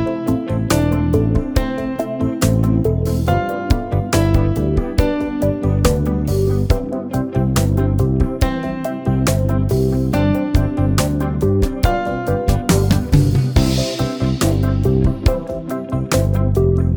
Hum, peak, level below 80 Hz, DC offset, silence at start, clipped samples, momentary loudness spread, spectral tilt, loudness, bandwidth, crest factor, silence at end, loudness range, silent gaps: none; 0 dBFS; -24 dBFS; under 0.1%; 0 s; under 0.1%; 5 LU; -6.5 dB/octave; -18 LUFS; over 20 kHz; 16 dB; 0 s; 1 LU; none